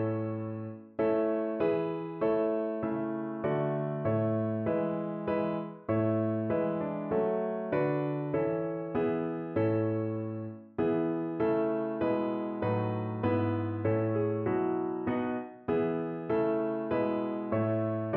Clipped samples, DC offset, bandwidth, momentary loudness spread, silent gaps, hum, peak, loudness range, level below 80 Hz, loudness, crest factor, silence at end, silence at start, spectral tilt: under 0.1%; under 0.1%; 4.3 kHz; 5 LU; none; none; -16 dBFS; 1 LU; -64 dBFS; -31 LUFS; 14 dB; 0 s; 0 s; -8 dB/octave